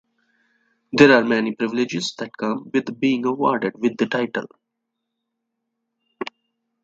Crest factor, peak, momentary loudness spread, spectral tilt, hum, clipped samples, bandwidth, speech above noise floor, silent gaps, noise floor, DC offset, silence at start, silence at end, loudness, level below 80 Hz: 22 dB; 0 dBFS; 16 LU; -5 dB/octave; none; under 0.1%; 8 kHz; 60 dB; none; -79 dBFS; under 0.1%; 0.95 s; 0.6 s; -20 LUFS; -66 dBFS